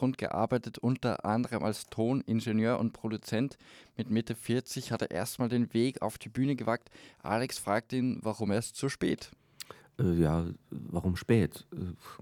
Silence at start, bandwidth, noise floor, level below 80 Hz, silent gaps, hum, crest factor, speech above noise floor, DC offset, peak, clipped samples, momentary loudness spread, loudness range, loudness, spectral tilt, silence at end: 0 s; 18 kHz; -51 dBFS; -56 dBFS; none; none; 18 dB; 19 dB; under 0.1%; -14 dBFS; under 0.1%; 12 LU; 2 LU; -32 LUFS; -6.5 dB/octave; 0.05 s